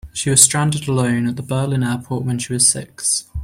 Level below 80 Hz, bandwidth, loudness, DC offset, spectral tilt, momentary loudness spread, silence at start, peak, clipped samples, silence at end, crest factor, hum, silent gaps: -42 dBFS; 16 kHz; -16 LUFS; under 0.1%; -3.5 dB/octave; 11 LU; 0.05 s; 0 dBFS; under 0.1%; 0 s; 18 dB; none; none